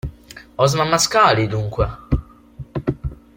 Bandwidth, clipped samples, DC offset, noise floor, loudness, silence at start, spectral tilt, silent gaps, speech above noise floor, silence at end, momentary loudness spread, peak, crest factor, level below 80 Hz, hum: 16.5 kHz; under 0.1%; under 0.1%; -39 dBFS; -18 LUFS; 0.05 s; -4.5 dB/octave; none; 22 dB; 0.25 s; 18 LU; -2 dBFS; 18 dB; -34 dBFS; none